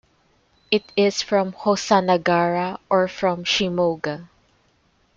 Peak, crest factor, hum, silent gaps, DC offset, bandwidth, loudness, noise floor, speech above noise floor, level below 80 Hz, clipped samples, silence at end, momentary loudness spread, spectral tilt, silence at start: -2 dBFS; 20 dB; none; none; under 0.1%; 7.8 kHz; -21 LUFS; -62 dBFS; 42 dB; -60 dBFS; under 0.1%; 0.9 s; 6 LU; -4.5 dB/octave; 0.7 s